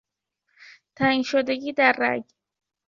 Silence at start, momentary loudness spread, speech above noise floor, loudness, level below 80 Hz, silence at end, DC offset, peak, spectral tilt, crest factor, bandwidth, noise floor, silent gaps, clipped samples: 0.6 s; 7 LU; 53 dB; -22 LUFS; -64 dBFS; 0.65 s; under 0.1%; -4 dBFS; -5 dB/octave; 22 dB; 7.4 kHz; -76 dBFS; none; under 0.1%